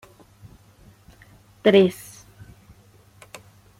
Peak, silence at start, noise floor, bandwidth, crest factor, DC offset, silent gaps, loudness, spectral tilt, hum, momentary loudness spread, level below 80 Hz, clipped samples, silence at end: -4 dBFS; 1.65 s; -53 dBFS; 16 kHz; 22 dB; under 0.1%; none; -19 LUFS; -6 dB/octave; none; 28 LU; -58 dBFS; under 0.1%; 1.85 s